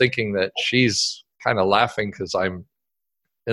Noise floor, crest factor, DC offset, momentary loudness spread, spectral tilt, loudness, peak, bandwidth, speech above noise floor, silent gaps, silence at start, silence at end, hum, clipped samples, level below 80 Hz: -84 dBFS; 20 dB; under 0.1%; 9 LU; -4 dB/octave; -21 LUFS; -2 dBFS; 12 kHz; 62 dB; none; 0 s; 0 s; none; under 0.1%; -52 dBFS